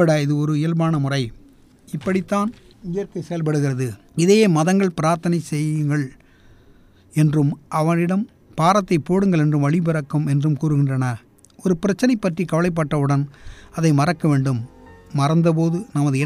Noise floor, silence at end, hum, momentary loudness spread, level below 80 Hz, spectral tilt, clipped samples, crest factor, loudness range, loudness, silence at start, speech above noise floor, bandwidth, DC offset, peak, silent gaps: -50 dBFS; 0 s; none; 10 LU; -50 dBFS; -7 dB/octave; under 0.1%; 16 dB; 3 LU; -20 LUFS; 0 s; 31 dB; 13.5 kHz; under 0.1%; -2 dBFS; none